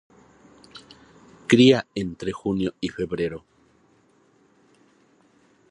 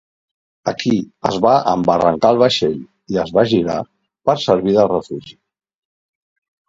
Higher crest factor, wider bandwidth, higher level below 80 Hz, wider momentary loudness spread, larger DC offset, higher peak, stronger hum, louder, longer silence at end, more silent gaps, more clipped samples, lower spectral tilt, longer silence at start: first, 24 dB vs 18 dB; first, 11 kHz vs 7.8 kHz; about the same, -56 dBFS vs -52 dBFS; first, 29 LU vs 11 LU; neither; about the same, -2 dBFS vs 0 dBFS; neither; second, -22 LUFS vs -16 LUFS; first, 2.3 s vs 1.35 s; neither; neither; about the same, -6 dB/octave vs -6 dB/octave; about the same, 0.75 s vs 0.65 s